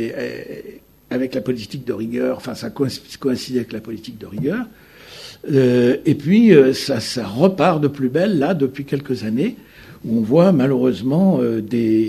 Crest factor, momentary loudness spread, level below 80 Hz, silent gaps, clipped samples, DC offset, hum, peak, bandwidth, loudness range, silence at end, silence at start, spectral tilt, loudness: 18 dB; 16 LU; -56 dBFS; none; under 0.1%; under 0.1%; none; 0 dBFS; 13.5 kHz; 9 LU; 0 s; 0 s; -7 dB/octave; -18 LUFS